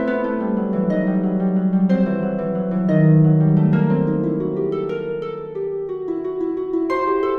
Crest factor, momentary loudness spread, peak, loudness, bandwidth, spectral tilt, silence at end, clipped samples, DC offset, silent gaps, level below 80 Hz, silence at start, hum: 14 dB; 11 LU; -6 dBFS; -19 LUFS; 4.5 kHz; -11 dB/octave; 0 s; under 0.1%; under 0.1%; none; -52 dBFS; 0 s; none